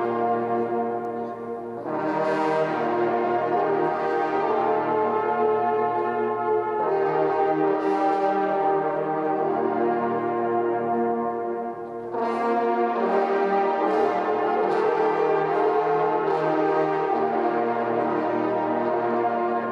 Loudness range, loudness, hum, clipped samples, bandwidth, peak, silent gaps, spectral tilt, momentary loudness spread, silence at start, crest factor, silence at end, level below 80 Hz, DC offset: 3 LU; -24 LUFS; none; under 0.1%; 7.6 kHz; -10 dBFS; none; -7.5 dB/octave; 4 LU; 0 s; 14 dB; 0 s; -72 dBFS; under 0.1%